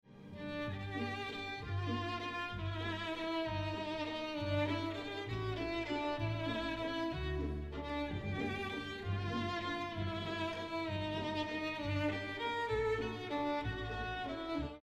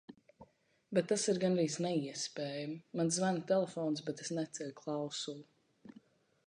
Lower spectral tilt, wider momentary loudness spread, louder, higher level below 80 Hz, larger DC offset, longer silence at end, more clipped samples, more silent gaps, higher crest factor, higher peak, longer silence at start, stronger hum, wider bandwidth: first, -6.5 dB/octave vs -4.5 dB/octave; second, 4 LU vs 10 LU; second, -39 LUFS vs -36 LUFS; first, -54 dBFS vs -80 dBFS; neither; second, 0.05 s vs 0.55 s; neither; neither; second, 14 dB vs 20 dB; second, -24 dBFS vs -18 dBFS; about the same, 0.05 s vs 0.1 s; neither; first, 12 kHz vs 10.5 kHz